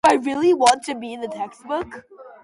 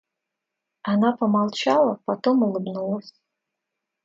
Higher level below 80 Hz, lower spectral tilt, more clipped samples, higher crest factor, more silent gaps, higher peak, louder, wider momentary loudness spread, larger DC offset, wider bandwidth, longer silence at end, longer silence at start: first, -60 dBFS vs -72 dBFS; second, -3 dB/octave vs -6.5 dB/octave; neither; about the same, 20 dB vs 18 dB; neither; first, -2 dBFS vs -6 dBFS; about the same, -21 LUFS vs -22 LUFS; first, 16 LU vs 9 LU; neither; first, 11.5 kHz vs 7.8 kHz; second, 0.15 s vs 0.95 s; second, 0.05 s vs 0.85 s